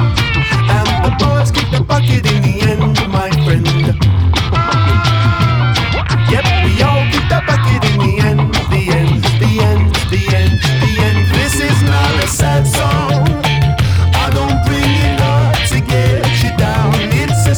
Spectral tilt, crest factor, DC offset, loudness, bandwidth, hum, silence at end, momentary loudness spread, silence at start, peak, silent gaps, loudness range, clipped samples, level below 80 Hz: -5.5 dB/octave; 10 dB; under 0.1%; -12 LUFS; over 20 kHz; none; 0 s; 2 LU; 0 s; -2 dBFS; none; 0 LU; under 0.1%; -22 dBFS